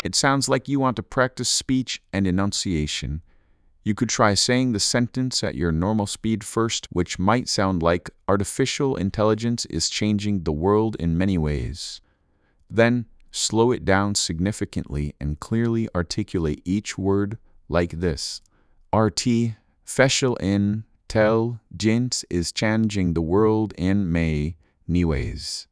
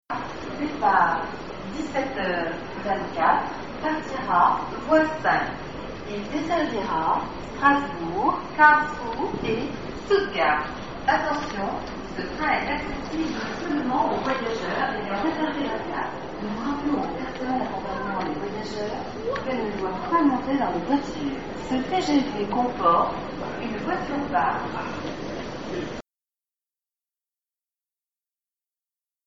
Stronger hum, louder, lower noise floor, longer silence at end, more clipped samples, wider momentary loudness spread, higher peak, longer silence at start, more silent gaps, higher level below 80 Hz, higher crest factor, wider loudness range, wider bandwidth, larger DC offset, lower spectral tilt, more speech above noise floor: neither; about the same, -23 LUFS vs -25 LUFS; second, -64 dBFS vs under -90 dBFS; about the same, 0.1 s vs 0 s; neither; second, 9 LU vs 12 LU; about the same, -4 dBFS vs -2 dBFS; about the same, 0.05 s vs 0 s; neither; first, -40 dBFS vs -48 dBFS; about the same, 20 dB vs 22 dB; second, 3 LU vs 7 LU; first, 11 kHz vs 7.8 kHz; second, under 0.1% vs 0.6%; about the same, -4.5 dB/octave vs -5.5 dB/octave; second, 41 dB vs over 65 dB